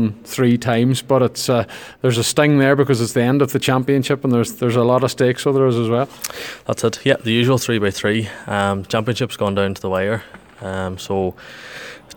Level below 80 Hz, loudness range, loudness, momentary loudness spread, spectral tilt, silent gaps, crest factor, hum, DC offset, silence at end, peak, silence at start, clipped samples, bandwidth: -54 dBFS; 5 LU; -18 LUFS; 10 LU; -5.5 dB/octave; none; 18 dB; none; under 0.1%; 0.05 s; 0 dBFS; 0 s; under 0.1%; 19.5 kHz